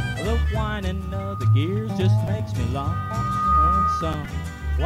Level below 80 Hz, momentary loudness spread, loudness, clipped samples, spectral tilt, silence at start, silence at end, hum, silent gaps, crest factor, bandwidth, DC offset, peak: -30 dBFS; 10 LU; -23 LUFS; under 0.1%; -7 dB/octave; 0 s; 0 s; none; none; 12 dB; 13.5 kHz; under 0.1%; -10 dBFS